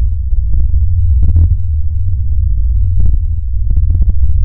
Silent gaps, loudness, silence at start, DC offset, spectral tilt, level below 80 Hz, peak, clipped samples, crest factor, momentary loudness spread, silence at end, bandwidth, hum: none; -15 LUFS; 0 s; under 0.1%; -14 dB/octave; -12 dBFS; 0 dBFS; under 0.1%; 8 dB; 5 LU; 0 s; 1 kHz; none